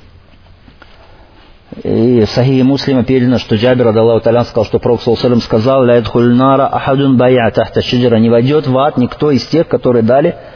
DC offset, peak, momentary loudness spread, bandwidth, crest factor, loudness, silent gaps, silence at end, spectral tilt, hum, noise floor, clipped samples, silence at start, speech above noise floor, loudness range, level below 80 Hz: under 0.1%; 0 dBFS; 4 LU; 5.4 kHz; 10 dB; -11 LUFS; none; 0 s; -8 dB/octave; none; -40 dBFS; under 0.1%; 1.75 s; 30 dB; 3 LU; -38 dBFS